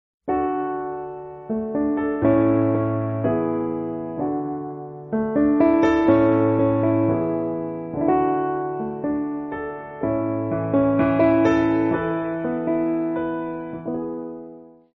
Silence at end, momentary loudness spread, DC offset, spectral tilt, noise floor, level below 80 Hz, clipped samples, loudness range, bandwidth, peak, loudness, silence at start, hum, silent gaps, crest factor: 0.3 s; 13 LU; under 0.1%; -8 dB/octave; -43 dBFS; -50 dBFS; under 0.1%; 4 LU; 6.2 kHz; -6 dBFS; -22 LUFS; 0.25 s; none; none; 16 dB